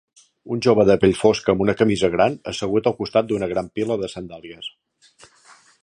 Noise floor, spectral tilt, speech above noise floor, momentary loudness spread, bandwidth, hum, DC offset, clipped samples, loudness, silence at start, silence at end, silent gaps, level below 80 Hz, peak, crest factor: -52 dBFS; -6 dB/octave; 33 dB; 18 LU; 10.5 kHz; none; under 0.1%; under 0.1%; -20 LUFS; 0.45 s; 1.15 s; none; -50 dBFS; -2 dBFS; 20 dB